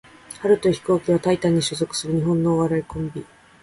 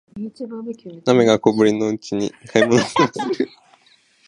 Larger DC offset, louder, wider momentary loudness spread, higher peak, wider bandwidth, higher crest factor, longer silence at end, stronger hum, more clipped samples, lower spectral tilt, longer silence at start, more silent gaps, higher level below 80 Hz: neither; second, -21 LUFS vs -18 LUFS; second, 11 LU vs 16 LU; second, -6 dBFS vs 0 dBFS; about the same, 11.5 kHz vs 11 kHz; about the same, 16 dB vs 20 dB; second, 0.4 s vs 0.8 s; neither; neither; about the same, -6 dB/octave vs -5.5 dB/octave; first, 0.3 s vs 0.15 s; neither; first, -50 dBFS vs -60 dBFS